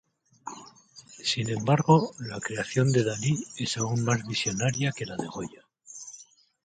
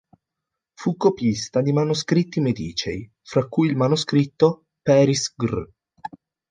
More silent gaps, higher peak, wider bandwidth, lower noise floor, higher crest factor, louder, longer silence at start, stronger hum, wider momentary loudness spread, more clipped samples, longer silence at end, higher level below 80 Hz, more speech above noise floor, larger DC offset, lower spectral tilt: neither; about the same, -6 dBFS vs -4 dBFS; about the same, 9.6 kHz vs 9.8 kHz; second, -52 dBFS vs -84 dBFS; about the same, 22 dB vs 18 dB; second, -27 LUFS vs -21 LUFS; second, 0.45 s vs 0.8 s; neither; first, 20 LU vs 14 LU; neither; about the same, 0.4 s vs 0.45 s; second, -62 dBFS vs -52 dBFS; second, 26 dB vs 63 dB; neither; about the same, -5 dB/octave vs -6 dB/octave